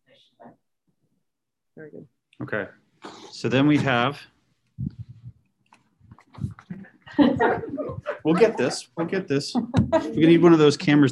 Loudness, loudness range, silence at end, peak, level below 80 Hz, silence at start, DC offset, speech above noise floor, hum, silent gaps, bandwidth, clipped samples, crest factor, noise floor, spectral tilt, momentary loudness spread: -21 LUFS; 14 LU; 0 s; -4 dBFS; -52 dBFS; 0.45 s; under 0.1%; 63 dB; none; none; 11.5 kHz; under 0.1%; 20 dB; -83 dBFS; -6.5 dB/octave; 24 LU